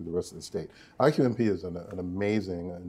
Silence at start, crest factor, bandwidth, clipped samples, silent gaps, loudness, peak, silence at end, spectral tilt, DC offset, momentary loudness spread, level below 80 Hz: 0 s; 20 dB; 14 kHz; under 0.1%; none; -29 LUFS; -8 dBFS; 0 s; -7 dB/octave; under 0.1%; 13 LU; -58 dBFS